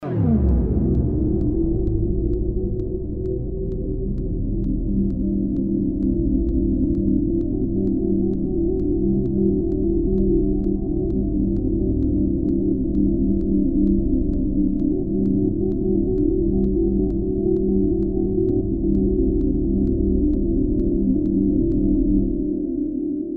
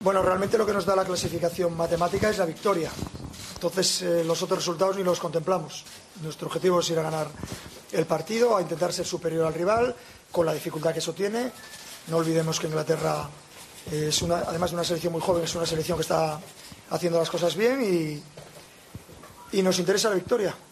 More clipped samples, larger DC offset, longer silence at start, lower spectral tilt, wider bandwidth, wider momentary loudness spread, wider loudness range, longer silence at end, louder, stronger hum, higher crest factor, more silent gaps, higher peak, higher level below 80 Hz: neither; neither; about the same, 0 s vs 0 s; first, -14 dB/octave vs -4.5 dB/octave; second, 1.9 kHz vs 13.5 kHz; second, 5 LU vs 16 LU; about the same, 3 LU vs 2 LU; about the same, 0 s vs 0.1 s; first, -21 LUFS vs -26 LUFS; neither; about the same, 14 dB vs 18 dB; neither; about the same, -6 dBFS vs -8 dBFS; first, -26 dBFS vs -56 dBFS